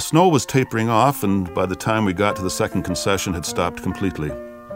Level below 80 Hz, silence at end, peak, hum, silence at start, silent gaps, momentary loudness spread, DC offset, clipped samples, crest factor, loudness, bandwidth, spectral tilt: -44 dBFS; 0 s; -2 dBFS; none; 0 s; none; 8 LU; under 0.1%; under 0.1%; 20 dB; -20 LUFS; 16.5 kHz; -5 dB/octave